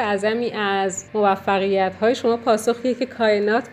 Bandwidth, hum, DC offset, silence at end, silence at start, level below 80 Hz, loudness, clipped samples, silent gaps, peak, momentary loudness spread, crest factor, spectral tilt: 14.5 kHz; none; under 0.1%; 0 s; 0 s; -64 dBFS; -20 LUFS; under 0.1%; none; -6 dBFS; 4 LU; 16 dB; -4.5 dB/octave